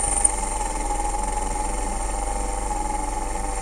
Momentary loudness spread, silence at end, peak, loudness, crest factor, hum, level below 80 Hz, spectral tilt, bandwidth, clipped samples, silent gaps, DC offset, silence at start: 7 LU; 0 s; -2 dBFS; -25 LUFS; 22 dB; none; -28 dBFS; -3 dB/octave; 13.5 kHz; under 0.1%; none; under 0.1%; 0 s